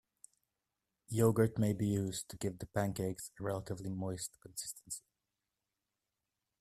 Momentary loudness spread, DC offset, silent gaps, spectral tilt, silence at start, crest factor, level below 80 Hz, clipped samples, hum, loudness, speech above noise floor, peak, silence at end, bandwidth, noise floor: 12 LU; under 0.1%; none; -6 dB/octave; 1.1 s; 22 dB; -66 dBFS; under 0.1%; none; -37 LUFS; 53 dB; -16 dBFS; 1.6 s; 15 kHz; -89 dBFS